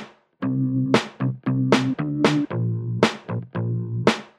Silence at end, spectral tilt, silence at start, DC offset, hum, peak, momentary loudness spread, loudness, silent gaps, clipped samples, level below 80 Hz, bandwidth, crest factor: 0.1 s; -6.5 dB/octave; 0 s; under 0.1%; none; 0 dBFS; 7 LU; -23 LUFS; none; under 0.1%; -60 dBFS; 11.5 kHz; 22 dB